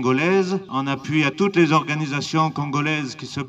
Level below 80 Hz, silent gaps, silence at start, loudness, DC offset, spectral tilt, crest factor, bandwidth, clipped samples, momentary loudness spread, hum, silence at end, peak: -62 dBFS; none; 0 s; -21 LUFS; under 0.1%; -6 dB/octave; 16 dB; 8.6 kHz; under 0.1%; 7 LU; none; 0 s; -6 dBFS